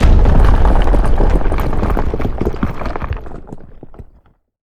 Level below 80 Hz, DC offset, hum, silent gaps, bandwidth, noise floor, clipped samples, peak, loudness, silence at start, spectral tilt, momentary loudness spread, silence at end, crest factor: -14 dBFS; under 0.1%; none; none; 6.4 kHz; -50 dBFS; under 0.1%; 0 dBFS; -17 LUFS; 0 s; -8 dB/octave; 18 LU; 0.6 s; 12 dB